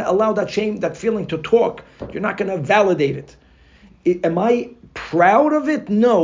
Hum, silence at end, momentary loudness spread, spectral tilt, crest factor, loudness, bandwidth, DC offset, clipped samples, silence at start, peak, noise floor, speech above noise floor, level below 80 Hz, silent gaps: none; 0 s; 10 LU; -6.5 dB/octave; 16 dB; -18 LUFS; 7.6 kHz; under 0.1%; under 0.1%; 0 s; -2 dBFS; -49 dBFS; 31 dB; -52 dBFS; none